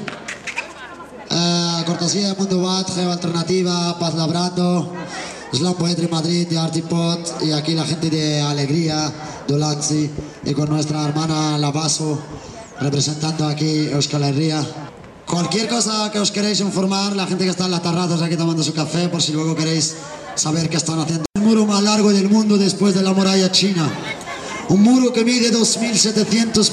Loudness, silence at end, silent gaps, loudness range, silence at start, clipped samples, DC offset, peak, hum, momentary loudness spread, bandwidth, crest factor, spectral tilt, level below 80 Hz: -18 LUFS; 0 s; none; 4 LU; 0 s; under 0.1%; under 0.1%; -2 dBFS; none; 12 LU; 12.5 kHz; 18 dB; -4.5 dB/octave; -54 dBFS